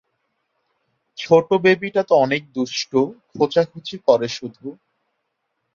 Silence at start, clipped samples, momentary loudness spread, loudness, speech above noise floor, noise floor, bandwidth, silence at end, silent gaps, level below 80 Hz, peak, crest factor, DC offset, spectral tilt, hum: 1.2 s; under 0.1%; 17 LU; -19 LUFS; 56 dB; -75 dBFS; 7.4 kHz; 1 s; none; -66 dBFS; -2 dBFS; 20 dB; under 0.1%; -5 dB/octave; none